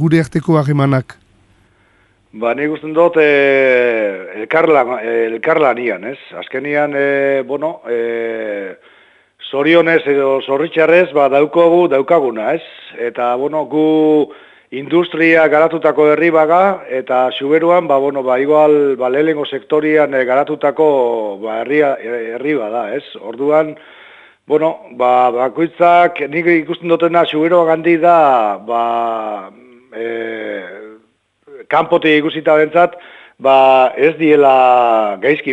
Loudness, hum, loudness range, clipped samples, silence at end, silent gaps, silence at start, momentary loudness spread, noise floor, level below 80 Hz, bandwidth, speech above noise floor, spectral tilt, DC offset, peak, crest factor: -13 LUFS; none; 6 LU; under 0.1%; 0 s; none; 0 s; 12 LU; -56 dBFS; -60 dBFS; 10.5 kHz; 43 dB; -7.5 dB/octave; under 0.1%; 0 dBFS; 14 dB